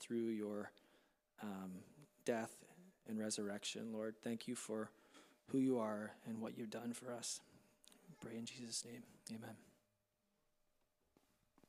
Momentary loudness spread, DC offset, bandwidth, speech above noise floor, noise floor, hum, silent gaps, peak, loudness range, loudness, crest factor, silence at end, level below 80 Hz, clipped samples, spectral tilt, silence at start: 20 LU; under 0.1%; 15 kHz; 40 dB; -85 dBFS; none; none; -26 dBFS; 8 LU; -46 LUFS; 22 dB; 2 s; -90 dBFS; under 0.1%; -4 dB/octave; 0 s